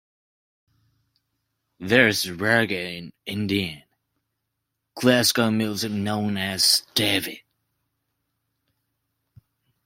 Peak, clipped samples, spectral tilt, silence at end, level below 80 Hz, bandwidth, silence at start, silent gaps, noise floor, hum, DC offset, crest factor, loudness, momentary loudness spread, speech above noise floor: -2 dBFS; under 0.1%; -3.5 dB/octave; 2.45 s; -64 dBFS; 16.5 kHz; 1.8 s; none; -80 dBFS; none; under 0.1%; 24 dB; -21 LUFS; 15 LU; 57 dB